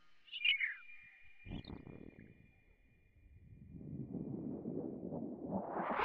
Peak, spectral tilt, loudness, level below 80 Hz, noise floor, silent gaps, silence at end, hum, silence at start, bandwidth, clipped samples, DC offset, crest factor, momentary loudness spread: -22 dBFS; -2 dB/octave; -41 LUFS; -66 dBFS; -69 dBFS; none; 0 s; none; 0 s; 6.2 kHz; under 0.1%; under 0.1%; 22 dB; 25 LU